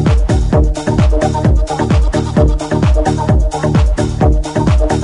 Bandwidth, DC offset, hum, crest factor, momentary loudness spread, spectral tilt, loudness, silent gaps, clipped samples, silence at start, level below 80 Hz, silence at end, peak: 11 kHz; under 0.1%; none; 12 dB; 2 LU; -7 dB/octave; -13 LUFS; none; under 0.1%; 0 s; -14 dBFS; 0 s; 0 dBFS